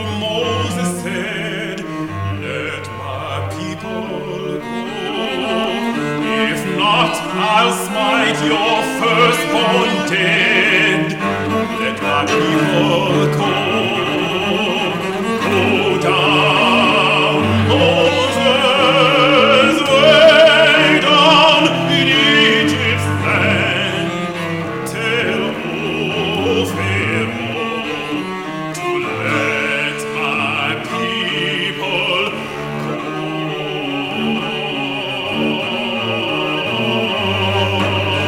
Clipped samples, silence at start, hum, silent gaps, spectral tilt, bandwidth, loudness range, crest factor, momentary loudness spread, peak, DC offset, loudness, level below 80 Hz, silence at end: under 0.1%; 0 s; none; none; -4.5 dB/octave; 16.5 kHz; 11 LU; 16 dB; 12 LU; 0 dBFS; under 0.1%; -15 LUFS; -50 dBFS; 0 s